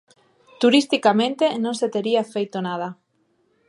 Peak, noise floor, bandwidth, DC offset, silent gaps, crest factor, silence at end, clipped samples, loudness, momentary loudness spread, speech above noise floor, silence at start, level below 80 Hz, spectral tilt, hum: -2 dBFS; -66 dBFS; 11.5 kHz; under 0.1%; none; 20 dB; 0.75 s; under 0.1%; -21 LUFS; 10 LU; 46 dB; 0.6 s; -78 dBFS; -4.5 dB/octave; none